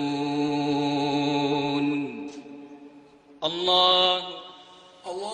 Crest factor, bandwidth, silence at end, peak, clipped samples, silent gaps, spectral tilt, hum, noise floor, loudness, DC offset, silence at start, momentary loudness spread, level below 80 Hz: 20 dB; 9.8 kHz; 0 s; -8 dBFS; under 0.1%; none; -5 dB/octave; none; -51 dBFS; -24 LUFS; under 0.1%; 0 s; 23 LU; -66 dBFS